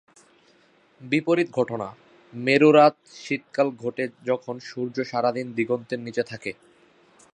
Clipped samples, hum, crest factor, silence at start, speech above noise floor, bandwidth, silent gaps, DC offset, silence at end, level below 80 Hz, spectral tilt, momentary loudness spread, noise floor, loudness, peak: under 0.1%; none; 20 dB; 1 s; 36 dB; 10 kHz; none; under 0.1%; 0.8 s; -72 dBFS; -6 dB/octave; 17 LU; -59 dBFS; -24 LUFS; -4 dBFS